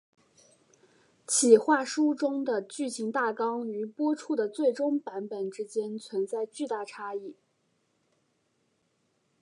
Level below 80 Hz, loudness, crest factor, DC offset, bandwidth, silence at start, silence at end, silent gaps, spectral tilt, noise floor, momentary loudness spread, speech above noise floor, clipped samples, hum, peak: -88 dBFS; -29 LUFS; 24 dB; under 0.1%; 11.5 kHz; 1.3 s; 2.1 s; none; -3 dB/octave; -74 dBFS; 15 LU; 45 dB; under 0.1%; none; -6 dBFS